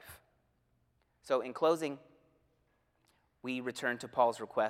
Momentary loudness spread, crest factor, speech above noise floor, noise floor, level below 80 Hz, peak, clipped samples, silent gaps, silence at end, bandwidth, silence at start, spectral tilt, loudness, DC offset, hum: 14 LU; 22 dB; 42 dB; -75 dBFS; -78 dBFS; -14 dBFS; under 0.1%; none; 0 s; 16 kHz; 0.05 s; -4.5 dB/octave; -34 LUFS; under 0.1%; none